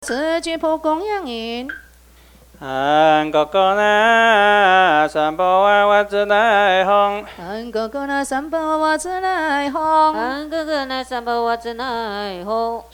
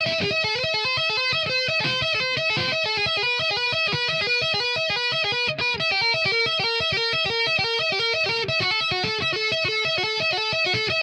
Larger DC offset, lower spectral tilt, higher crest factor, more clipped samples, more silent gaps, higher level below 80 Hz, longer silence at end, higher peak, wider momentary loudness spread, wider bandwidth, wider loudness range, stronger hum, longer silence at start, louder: neither; about the same, -3.5 dB/octave vs -3 dB/octave; first, 18 dB vs 12 dB; neither; neither; first, -50 dBFS vs -56 dBFS; about the same, 0.1 s vs 0 s; first, 0 dBFS vs -12 dBFS; first, 13 LU vs 2 LU; first, 19 kHz vs 14 kHz; first, 6 LU vs 1 LU; neither; about the same, 0 s vs 0 s; first, -17 LUFS vs -21 LUFS